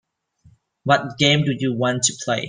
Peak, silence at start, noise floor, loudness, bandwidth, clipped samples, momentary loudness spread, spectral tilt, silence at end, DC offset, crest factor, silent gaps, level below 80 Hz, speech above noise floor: -2 dBFS; 0.85 s; -56 dBFS; -19 LUFS; 10 kHz; under 0.1%; 5 LU; -3.5 dB/octave; 0 s; under 0.1%; 18 dB; none; -58 dBFS; 36 dB